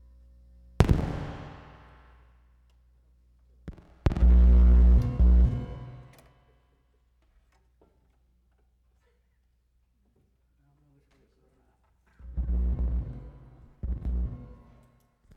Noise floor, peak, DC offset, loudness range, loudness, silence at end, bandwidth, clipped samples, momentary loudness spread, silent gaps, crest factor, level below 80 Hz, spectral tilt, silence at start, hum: -69 dBFS; -2 dBFS; under 0.1%; 14 LU; -25 LUFS; 0.9 s; 5 kHz; under 0.1%; 28 LU; none; 24 dB; -28 dBFS; -8.5 dB/octave; 0.8 s; none